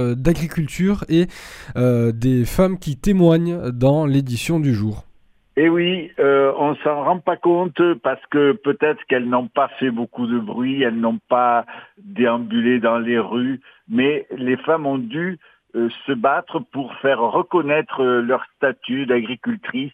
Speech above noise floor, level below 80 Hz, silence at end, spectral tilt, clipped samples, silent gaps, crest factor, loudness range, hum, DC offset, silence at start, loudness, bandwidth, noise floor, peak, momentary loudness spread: 33 dB; -42 dBFS; 0.05 s; -7 dB/octave; under 0.1%; none; 18 dB; 3 LU; none; under 0.1%; 0 s; -19 LUFS; 16 kHz; -52 dBFS; -2 dBFS; 8 LU